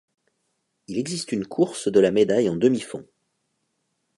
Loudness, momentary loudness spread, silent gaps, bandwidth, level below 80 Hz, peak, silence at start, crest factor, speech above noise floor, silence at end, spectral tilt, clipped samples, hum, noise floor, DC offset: -22 LUFS; 12 LU; none; 11.5 kHz; -64 dBFS; -6 dBFS; 0.9 s; 20 dB; 53 dB; 1.15 s; -5.5 dB/octave; under 0.1%; none; -74 dBFS; under 0.1%